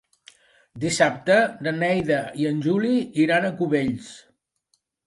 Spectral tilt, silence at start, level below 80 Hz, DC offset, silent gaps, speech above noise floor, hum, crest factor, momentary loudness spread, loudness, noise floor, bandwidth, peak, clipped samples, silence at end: -5.5 dB/octave; 0.75 s; -62 dBFS; under 0.1%; none; 49 dB; none; 20 dB; 8 LU; -22 LUFS; -71 dBFS; 11.5 kHz; -4 dBFS; under 0.1%; 0.85 s